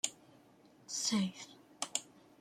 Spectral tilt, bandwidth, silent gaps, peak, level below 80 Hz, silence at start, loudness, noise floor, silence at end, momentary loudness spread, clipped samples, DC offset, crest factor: -2.5 dB/octave; 15.5 kHz; none; -14 dBFS; -82 dBFS; 0.05 s; -37 LUFS; -64 dBFS; 0.35 s; 15 LU; under 0.1%; under 0.1%; 28 dB